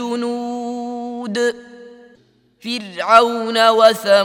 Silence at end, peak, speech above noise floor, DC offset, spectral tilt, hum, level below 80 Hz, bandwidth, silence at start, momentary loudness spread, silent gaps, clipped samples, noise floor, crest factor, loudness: 0 s; 0 dBFS; 40 dB; under 0.1%; -3.5 dB/octave; none; -66 dBFS; 17.5 kHz; 0 s; 15 LU; none; under 0.1%; -54 dBFS; 18 dB; -17 LUFS